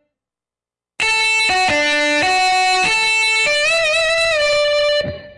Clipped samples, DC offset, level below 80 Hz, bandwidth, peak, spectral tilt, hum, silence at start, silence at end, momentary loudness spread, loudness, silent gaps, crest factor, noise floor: under 0.1%; under 0.1%; -48 dBFS; 11.5 kHz; -8 dBFS; -1 dB/octave; none; 1 s; 0.05 s; 3 LU; -14 LUFS; none; 8 dB; under -90 dBFS